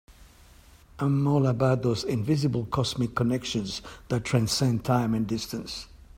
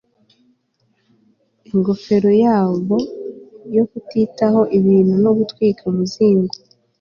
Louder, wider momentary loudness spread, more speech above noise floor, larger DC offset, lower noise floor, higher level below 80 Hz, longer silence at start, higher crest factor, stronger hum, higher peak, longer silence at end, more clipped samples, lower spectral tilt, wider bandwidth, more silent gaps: second, -27 LUFS vs -16 LUFS; about the same, 10 LU vs 11 LU; second, 27 dB vs 49 dB; neither; second, -53 dBFS vs -64 dBFS; first, -50 dBFS vs -58 dBFS; second, 0.1 s vs 1.75 s; about the same, 18 dB vs 14 dB; neither; second, -8 dBFS vs -2 dBFS; second, 0 s vs 0.5 s; neither; second, -6 dB/octave vs -8.5 dB/octave; first, 16 kHz vs 7 kHz; neither